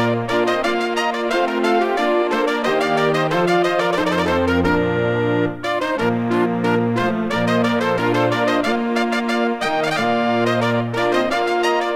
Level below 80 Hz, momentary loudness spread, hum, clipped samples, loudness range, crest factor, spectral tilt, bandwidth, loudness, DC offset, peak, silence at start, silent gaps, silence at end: -48 dBFS; 2 LU; none; under 0.1%; 1 LU; 14 dB; -5.5 dB/octave; 16 kHz; -18 LUFS; 0.2%; -4 dBFS; 0 s; none; 0 s